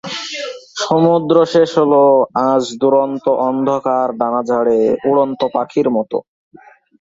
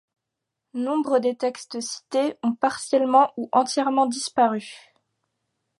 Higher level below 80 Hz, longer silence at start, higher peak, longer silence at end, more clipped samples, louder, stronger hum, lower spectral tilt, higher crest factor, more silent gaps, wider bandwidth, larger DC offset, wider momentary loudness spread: first, -60 dBFS vs -78 dBFS; second, 0.05 s vs 0.75 s; about the same, -2 dBFS vs -4 dBFS; second, 0.8 s vs 1 s; neither; first, -15 LUFS vs -23 LUFS; neither; first, -6 dB/octave vs -3.5 dB/octave; second, 14 dB vs 20 dB; neither; second, 7.8 kHz vs 11.5 kHz; neither; about the same, 11 LU vs 12 LU